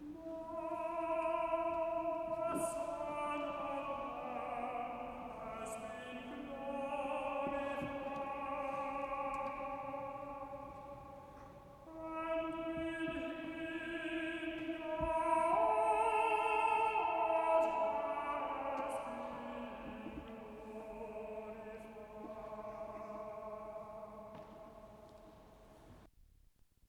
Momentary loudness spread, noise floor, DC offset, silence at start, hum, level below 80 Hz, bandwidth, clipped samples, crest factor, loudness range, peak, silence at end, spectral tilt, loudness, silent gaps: 18 LU; -68 dBFS; under 0.1%; 0 s; none; -64 dBFS; 14.5 kHz; under 0.1%; 20 dB; 14 LU; -20 dBFS; 0.65 s; -5 dB/octave; -40 LUFS; none